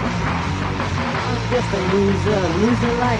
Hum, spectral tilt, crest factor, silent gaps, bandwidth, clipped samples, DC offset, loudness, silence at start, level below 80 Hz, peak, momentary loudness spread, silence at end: none; -6 dB/octave; 14 dB; none; 10.5 kHz; under 0.1%; under 0.1%; -20 LUFS; 0 s; -34 dBFS; -4 dBFS; 4 LU; 0 s